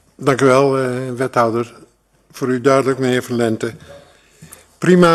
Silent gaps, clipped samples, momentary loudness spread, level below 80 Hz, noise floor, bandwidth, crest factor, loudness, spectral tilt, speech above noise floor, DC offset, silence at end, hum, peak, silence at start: none; under 0.1%; 11 LU; -56 dBFS; -53 dBFS; 13 kHz; 16 dB; -16 LUFS; -6 dB/octave; 38 dB; under 0.1%; 0 s; none; 0 dBFS; 0.2 s